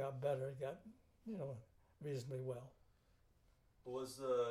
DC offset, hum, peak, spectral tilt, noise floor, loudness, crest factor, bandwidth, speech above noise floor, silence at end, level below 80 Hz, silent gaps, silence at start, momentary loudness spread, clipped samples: under 0.1%; none; -28 dBFS; -6.5 dB/octave; -74 dBFS; -46 LUFS; 18 dB; 15.5 kHz; 30 dB; 0 s; -76 dBFS; none; 0 s; 16 LU; under 0.1%